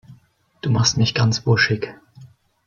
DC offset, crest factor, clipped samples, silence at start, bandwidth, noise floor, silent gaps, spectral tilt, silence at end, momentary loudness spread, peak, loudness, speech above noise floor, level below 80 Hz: under 0.1%; 18 dB; under 0.1%; 0.1 s; 7.2 kHz; -55 dBFS; none; -4.5 dB/octave; 0.4 s; 11 LU; -4 dBFS; -19 LUFS; 37 dB; -52 dBFS